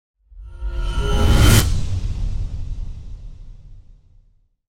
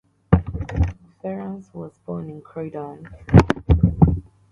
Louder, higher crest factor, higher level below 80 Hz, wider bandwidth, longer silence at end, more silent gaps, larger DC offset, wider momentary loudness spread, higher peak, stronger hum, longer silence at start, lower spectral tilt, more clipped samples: about the same, -20 LUFS vs -20 LUFS; about the same, 18 dB vs 20 dB; first, -22 dBFS vs -28 dBFS; first, 16.5 kHz vs 7.6 kHz; first, 0.65 s vs 0.3 s; neither; neither; first, 25 LU vs 19 LU; about the same, -2 dBFS vs 0 dBFS; neither; about the same, 0.3 s vs 0.3 s; second, -4.5 dB/octave vs -9 dB/octave; neither